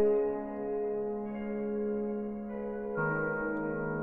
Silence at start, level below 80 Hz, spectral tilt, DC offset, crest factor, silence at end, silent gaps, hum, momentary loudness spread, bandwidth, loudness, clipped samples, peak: 0 s; -58 dBFS; -11 dB/octave; under 0.1%; 14 dB; 0 s; none; none; 6 LU; 3 kHz; -34 LUFS; under 0.1%; -20 dBFS